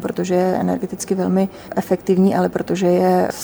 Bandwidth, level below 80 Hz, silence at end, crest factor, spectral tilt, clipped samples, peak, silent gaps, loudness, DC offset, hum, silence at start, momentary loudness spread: over 20 kHz; -52 dBFS; 0 s; 14 dB; -6.5 dB/octave; under 0.1%; -4 dBFS; none; -18 LUFS; under 0.1%; none; 0 s; 7 LU